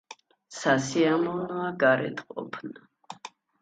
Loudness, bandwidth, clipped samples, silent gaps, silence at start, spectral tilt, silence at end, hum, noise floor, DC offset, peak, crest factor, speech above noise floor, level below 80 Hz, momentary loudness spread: -26 LUFS; 9.4 kHz; under 0.1%; none; 0.1 s; -5 dB/octave; 0.35 s; none; -50 dBFS; under 0.1%; -10 dBFS; 20 dB; 24 dB; -70 dBFS; 20 LU